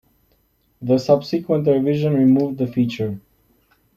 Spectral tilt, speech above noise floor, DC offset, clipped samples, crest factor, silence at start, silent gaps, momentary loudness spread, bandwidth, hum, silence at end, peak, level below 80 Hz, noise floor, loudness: -8.5 dB/octave; 45 dB; under 0.1%; under 0.1%; 16 dB; 0.8 s; none; 11 LU; 13.5 kHz; none; 0.75 s; -2 dBFS; -58 dBFS; -62 dBFS; -19 LUFS